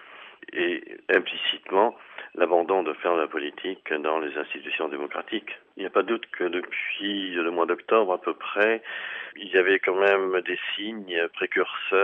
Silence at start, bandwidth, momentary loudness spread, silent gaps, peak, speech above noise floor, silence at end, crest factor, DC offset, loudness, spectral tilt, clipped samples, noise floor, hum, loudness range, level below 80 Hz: 0 s; 4.1 kHz; 11 LU; none; -6 dBFS; 20 dB; 0 s; 20 dB; under 0.1%; -26 LUFS; -5.5 dB/octave; under 0.1%; -46 dBFS; none; 5 LU; -82 dBFS